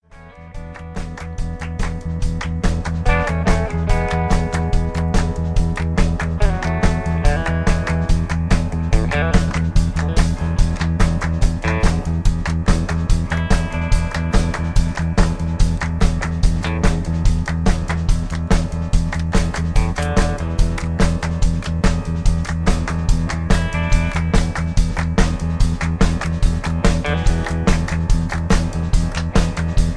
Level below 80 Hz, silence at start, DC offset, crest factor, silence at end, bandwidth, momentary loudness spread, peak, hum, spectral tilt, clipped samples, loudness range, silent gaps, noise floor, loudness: -20 dBFS; 0.15 s; 0.2%; 16 dB; 0 s; 11 kHz; 3 LU; 0 dBFS; none; -6 dB/octave; under 0.1%; 1 LU; none; -40 dBFS; -20 LUFS